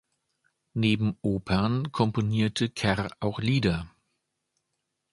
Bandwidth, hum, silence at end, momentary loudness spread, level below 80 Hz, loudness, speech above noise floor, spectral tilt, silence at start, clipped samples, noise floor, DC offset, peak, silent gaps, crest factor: 11.5 kHz; none; 1.25 s; 6 LU; -50 dBFS; -27 LUFS; 55 dB; -6.5 dB/octave; 0.75 s; under 0.1%; -81 dBFS; under 0.1%; -8 dBFS; none; 20 dB